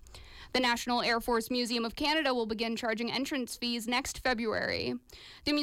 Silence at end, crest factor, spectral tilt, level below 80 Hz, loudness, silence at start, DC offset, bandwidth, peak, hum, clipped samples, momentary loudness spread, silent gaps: 0 s; 14 dB; -3 dB/octave; -56 dBFS; -31 LUFS; 0.05 s; under 0.1%; 16.5 kHz; -18 dBFS; none; under 0.1%; 8 LU; none